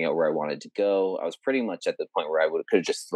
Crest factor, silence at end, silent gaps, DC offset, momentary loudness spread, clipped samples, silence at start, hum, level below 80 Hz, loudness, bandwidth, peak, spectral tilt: 20 dB; 0 s; none; under 0.1%; 6 LU; under 0.1%; 0 s; none; under -90 dBFS; -26 LUFS; 12.5 kHz; -6 dBFS; -4.5 dB/octave